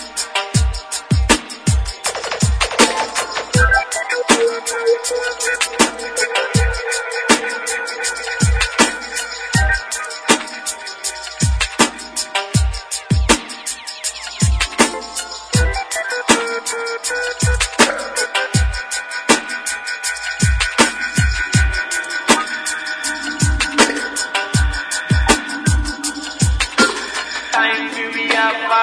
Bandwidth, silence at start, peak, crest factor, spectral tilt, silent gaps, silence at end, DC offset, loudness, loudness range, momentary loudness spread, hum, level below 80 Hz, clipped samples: 11 kHz; 0 s; 0 dBFS; 18 dB; -3 dB/octave; none; 0 s; under 0.1%; -17 LUFS; 2 LU; 8 LU; none; -26 dBFS; under 0.1%